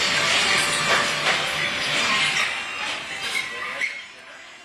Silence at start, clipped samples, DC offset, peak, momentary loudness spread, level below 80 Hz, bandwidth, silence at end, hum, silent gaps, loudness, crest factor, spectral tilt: 0 s; under 0.1%; under 0.1%; -6 dBFS; 10 LU; -58 dBFS; 14 kHz; 0 s; none; none; -21 LUFS; 18 dB; -0.5 dB/octave